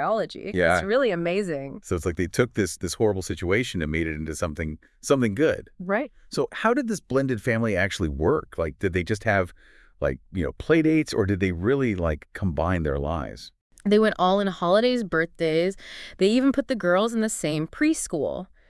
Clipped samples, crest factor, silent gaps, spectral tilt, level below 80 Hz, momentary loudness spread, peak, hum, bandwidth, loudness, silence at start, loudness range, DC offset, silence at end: under 0.1%; 18 dB; 13.61-13.70 s; -5.5 dB/octave; -44 dBFS; 10 LU; -6 dBFS; none; 12 kHz; -25 LUFS; 0 s; 3 LU; under 0.1%; 0.25 s